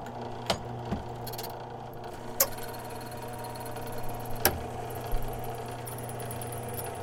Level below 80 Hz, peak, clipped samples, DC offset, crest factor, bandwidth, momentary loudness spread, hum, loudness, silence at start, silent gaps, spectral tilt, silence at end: -44 dBFS; -4 dBFS; under 0.1%; under 0.1%; 30 dB; 17 kHz; 12 LU; none; -35 LUFS; 0 s; none; -3.5 dB/octave; 0 s